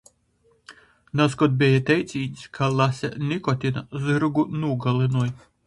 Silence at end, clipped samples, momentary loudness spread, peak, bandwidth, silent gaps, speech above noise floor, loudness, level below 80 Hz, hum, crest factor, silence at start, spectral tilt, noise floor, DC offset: 0.3 s; under 0.1%; 9 LU; -6 dBFS; 11.5 kHz; none; 41 dB; -23 LUFS; -56 dBFS; none; 18 dB; 0.7 s; -7 dB/octave; -63 dBFS; under 0.1%